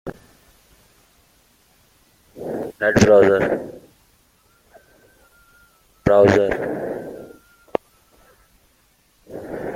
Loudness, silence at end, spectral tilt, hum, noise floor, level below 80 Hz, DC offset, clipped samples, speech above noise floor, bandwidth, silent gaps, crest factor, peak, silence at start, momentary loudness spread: -18 LUFS; 0 s; -6 dB/octave; none; -60 dBFS; -48 dBFS; under 0.1%; under 0.1%; 45 dB; 15.5 kHz; none; 20 dB; -2 dBFS; 0.05 s; 24 LU